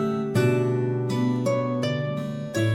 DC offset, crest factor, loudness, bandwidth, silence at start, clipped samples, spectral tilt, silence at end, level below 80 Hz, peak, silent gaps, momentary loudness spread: under 0.1%; 14 dB; -25 LUFS; 15 kHz; 0 s; under 0.1%; -7 dB/octave; 0 s; -62 dBFS; -10 dBFS; none; 6 LU